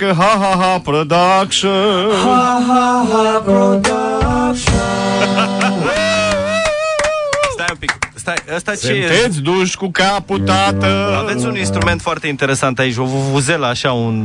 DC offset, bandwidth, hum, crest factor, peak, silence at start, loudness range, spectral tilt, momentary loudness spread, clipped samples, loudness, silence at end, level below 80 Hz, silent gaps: under 0.1%; 11 kHz; none; 14 dB; 0 dBFS; 0 s; 3 LU; -4.5 dB/octave; 6 LU; under 0.1%; -14 LUFS; 0 s; -34 dBFS; none